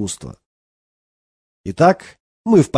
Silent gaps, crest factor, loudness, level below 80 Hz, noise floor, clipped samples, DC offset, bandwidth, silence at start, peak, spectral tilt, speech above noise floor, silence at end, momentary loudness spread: 0.46-1.64 s, 2.20-2.44 s; 18 dB; -16 LUFS; -54 dBFS; under -90 dBFS; under 0.1%; under 0.1%; 11 kHz; 0 s; -2 dBFS; -6.5 dB/octave; over 74 dB; 0 s; 18 LU